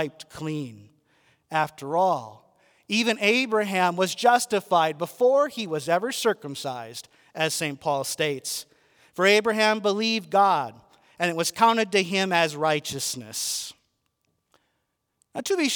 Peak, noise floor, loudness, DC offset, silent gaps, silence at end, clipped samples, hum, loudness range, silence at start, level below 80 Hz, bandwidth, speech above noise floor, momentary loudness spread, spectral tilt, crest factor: -6 dBFS; -76 dBFS; -24 LUFS; under 0.1%; none; 0 s; under 0.1%; none; 5 LU; 0 s; -72 dBFS; over 20 kHz; 52 dB; 13 LU; -3 dB/octave; 20 dB